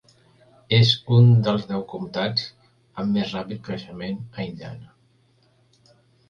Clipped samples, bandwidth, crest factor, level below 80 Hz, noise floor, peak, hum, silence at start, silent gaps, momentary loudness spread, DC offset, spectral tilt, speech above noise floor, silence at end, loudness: under 0.1%; 7 kHz; 18 dB; -56 dBFS; -61 dBFS; -6 dBFS; none; 0.7 s; none; 20 LU; under 0.1%; -7 dB/octave; 40 dB; 1.45 s; -22 LUFS